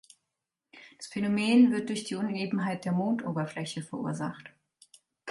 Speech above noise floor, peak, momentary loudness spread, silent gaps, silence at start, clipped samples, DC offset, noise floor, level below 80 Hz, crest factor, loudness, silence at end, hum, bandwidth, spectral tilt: 58 dB; -12 dBFS; 16 LU; none; 0.75 s; under 0.1%; under 0.1%; -86 dBFS; -74 dBFS; 18 dB; -29 LUFS; 0 s; none; 11.5 kHz; -6 dB/octave